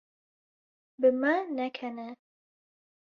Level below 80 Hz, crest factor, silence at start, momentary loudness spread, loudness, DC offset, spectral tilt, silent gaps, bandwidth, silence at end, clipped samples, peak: -80 dBFS; 20 dB; 1 s; 16 LU; -29 LUFS; under 0.1%; -6 dB/octave; none; 5.8 kHz; 0.9 s; under 0.1%; -12 dBFS